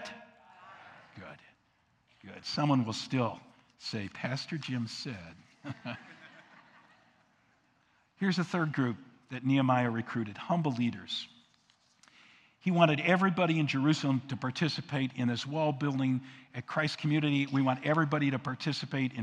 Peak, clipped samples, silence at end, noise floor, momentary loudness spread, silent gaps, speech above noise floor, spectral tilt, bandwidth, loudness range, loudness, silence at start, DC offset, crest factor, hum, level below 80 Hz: -10 dBFS; under 0.1%; 0 s; -71 dBFS; 19 LU; none; 40 dB; -6.5 dB/octave; 10 kHz; 10 LU; -31 LUFS; 0 s; under 0.1%; 22 dB; none; -78 dBFS